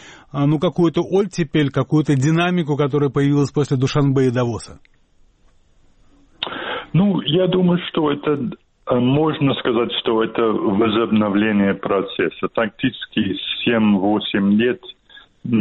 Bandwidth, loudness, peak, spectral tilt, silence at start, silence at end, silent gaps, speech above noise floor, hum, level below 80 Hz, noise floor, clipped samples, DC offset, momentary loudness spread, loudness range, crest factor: 8.8 kHz; -18 LUFS; -4 dBFS; -7 dB/octave; 0 s; 0 s; none; 36 dB; none; -50 dBFS; -54 dBFS; under 0.1%; under 0.1%; 8 LU; 4 LU; 16 dB